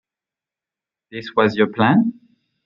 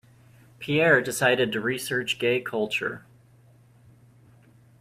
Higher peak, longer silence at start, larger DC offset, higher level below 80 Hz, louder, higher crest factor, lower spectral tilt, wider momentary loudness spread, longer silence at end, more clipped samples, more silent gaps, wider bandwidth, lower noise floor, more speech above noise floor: first, -2 dBFS vs -8 dBFS; first, 1.15 s vs 0.6 s; neither; about the same, -64 dBFS vs -66 dBFS; first, -18 LUFS vs -24 LUFS; about the same, 18 dB vs 20 dB; first, -8 dB/octave vs -4 dB/octave; first, 16 LU vs 11 LU; second, 0.55 s vs 1.8 s; neither; neither; second, 7 kHz vs 16 kHz; first, -89 dBFS vs -56 dBFS; first, 71 dB vs 31 dB